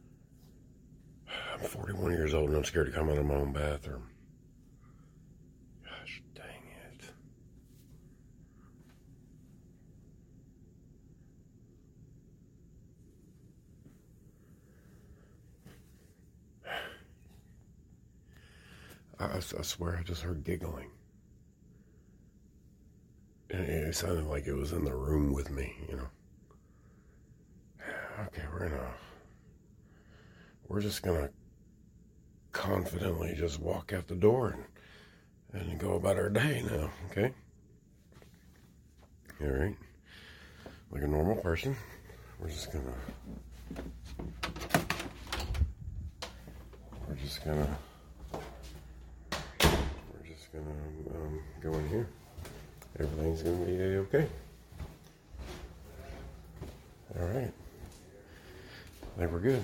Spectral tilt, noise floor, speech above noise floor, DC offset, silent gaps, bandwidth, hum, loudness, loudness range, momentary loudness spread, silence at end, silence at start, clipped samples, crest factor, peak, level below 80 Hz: -5.5 dB/octave; -61 dBFS; 27 dB; under 0.1%; none; 16.5 kHz; none; -35 LUFS; 15 LU; 23 LU; 0 s; 0.05 s; under 0.1%; 28 dB; -10 dBFS; -46 dBFS